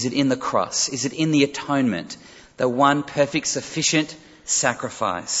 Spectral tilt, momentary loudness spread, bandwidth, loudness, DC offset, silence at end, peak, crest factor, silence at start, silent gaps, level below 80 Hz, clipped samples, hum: -3.5 dB/octave; 7 LU; 8.2 kHz; -21 LUFS; under 0.1%; 0 s; -4 dBFS; 20 dB; 0 s; none; -60 dBFS; under 0.1%; none